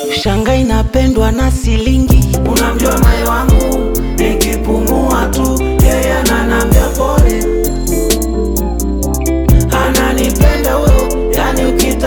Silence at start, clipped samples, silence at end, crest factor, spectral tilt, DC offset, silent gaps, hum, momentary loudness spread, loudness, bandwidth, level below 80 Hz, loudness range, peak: 0 s; under 0.1%; 0 s; 10 dB; -5.5 dB/octave; under 0.1%; none; none; 4 LU; -12 LUFS; over 20 kHz; -14 dBFS; 1 LU; 0 dBFS